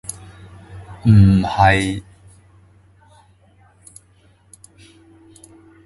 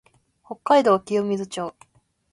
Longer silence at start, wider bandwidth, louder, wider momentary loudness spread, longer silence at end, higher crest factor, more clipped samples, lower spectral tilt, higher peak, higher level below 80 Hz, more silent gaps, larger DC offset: first, 0.7 s vs 0.5 s; about the same, 11.5 kHz vs 11.5 kHz; first, -15 LUFS vs -21 LUFS; first, 28 LU vs 17 LU; first, 3.85 s vs 0.6 s; about the same, 20 dB vs 20 dB; neither; about the same, -6.5 dB/octave vs -5.5 dB/octave; first, 0 dBFS vs -4 dBFS; first, -36 dBFS vs -68 dBFS; neither; neither